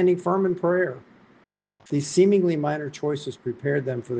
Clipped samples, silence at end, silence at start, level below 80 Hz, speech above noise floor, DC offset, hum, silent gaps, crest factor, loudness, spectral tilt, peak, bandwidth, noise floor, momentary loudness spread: under 0.1%; 0 s; 0 s; -68 dBFS; 37 dB; under 0.1%; none; none; 16 dB; -24 LUFS; -6.5 dB/octave; -8 dBFS; 9.4 kHz; -60 dBFS; 10 LU